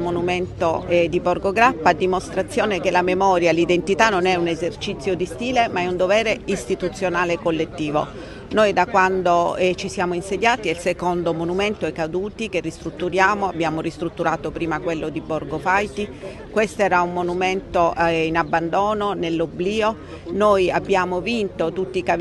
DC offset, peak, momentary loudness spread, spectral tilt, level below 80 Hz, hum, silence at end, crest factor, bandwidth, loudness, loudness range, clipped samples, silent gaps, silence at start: under 0.1%; 0 dBFS; 8 LU; -5 dB/octave; -44 dBFS; none; 0 s; 20 dB; 12 kHz; -21 LUFS; 4 LU; under 0.1%; none; 0 s